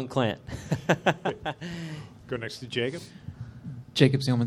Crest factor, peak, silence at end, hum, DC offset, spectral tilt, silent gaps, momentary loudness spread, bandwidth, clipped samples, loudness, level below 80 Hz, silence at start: 24 dB; -4 dBFS; 0 s; none; under 0.1%; -6 dB/octave; none; 19 LU; 13 kHz; under 0.1%; -28 LUFS; -56 dBFS; 0 s